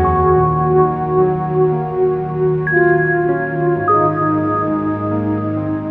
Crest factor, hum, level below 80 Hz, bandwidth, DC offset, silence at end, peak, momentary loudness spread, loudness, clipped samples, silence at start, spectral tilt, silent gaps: 12 dB; none; -36 dBFS; 3.8 kHz; under 0.1%; 0 s; -2 dBFS; 6 LU; -16 LUFS; under 0.1%; 0 s; -11.5 dB/octave; none